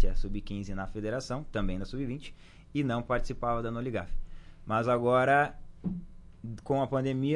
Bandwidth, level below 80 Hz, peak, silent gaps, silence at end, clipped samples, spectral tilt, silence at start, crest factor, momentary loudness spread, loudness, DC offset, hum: 10.5 kHz; -38 dBFS; -14 dBFS; none; 0 s; under 0.1%; -7 dB/octave; 0 s; 16 dB; 17 LU; -32 LUFS; under 0.1%; none